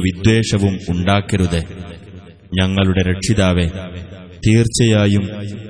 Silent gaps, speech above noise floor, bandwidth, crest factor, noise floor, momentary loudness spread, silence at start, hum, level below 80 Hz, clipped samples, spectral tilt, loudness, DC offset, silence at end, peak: none; 22 dB; 11 kHz; 16 dB; -38 dBFS; 17 LU; 0 s; none; -34 dBFS; under 0.1%; -5.5 dB/octave; -16 LUFS; under 0.1%; 0 s; 0 dBFS